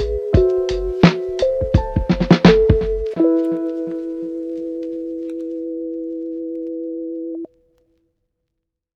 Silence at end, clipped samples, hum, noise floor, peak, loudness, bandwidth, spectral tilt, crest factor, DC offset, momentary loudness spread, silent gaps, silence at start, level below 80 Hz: 1.5 s; under 0.1%; none; -78 dBFS; 0 dBFS; -19 LUFS; 7.6 kHz; -8 dB/octave; 18 dB; under 0.1%; 13 LU; none; 0 s; -30 dBFS